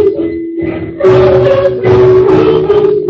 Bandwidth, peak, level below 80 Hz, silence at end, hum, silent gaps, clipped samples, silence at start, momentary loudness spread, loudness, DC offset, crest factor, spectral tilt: 6.2 kHz; 0 dBFS; -32 dBFS; 0 s; none; none; 0.2%; 0 s; 11 LU; -8 LUFS; under 0.1%; 8 dB; -9 dB/octave